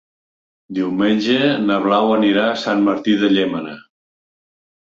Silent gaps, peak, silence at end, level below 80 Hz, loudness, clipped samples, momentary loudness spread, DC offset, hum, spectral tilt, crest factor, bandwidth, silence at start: none; -4 dBFS; 1.05 s; -60 dBFS; -17 LUFS; under 0.1%; 8 LU; under 0.1%; none; -6 dB/octave; 16 dB; 7.4 kHz; 0.7 s